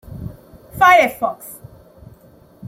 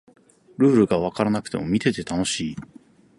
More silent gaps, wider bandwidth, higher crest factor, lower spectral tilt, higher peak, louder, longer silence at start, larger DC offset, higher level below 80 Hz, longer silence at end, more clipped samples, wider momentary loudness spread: neither; first, 16.5 kHz vs 11.5 kHz; about the same, 18 dB vs 18 dB; second, -4 dB/octave vs -5.5 dB/octave; about the same, -2 dBFS vs -4 dBFS; first, -14 LUFS vs -22 LUFS; second, 0.1 s vs 0.6 s; neither; about the same, -48 dBFS vs -52 dBFS; second, 0 s vs 0.6 s; neither; first, 24 LU vs 9 LU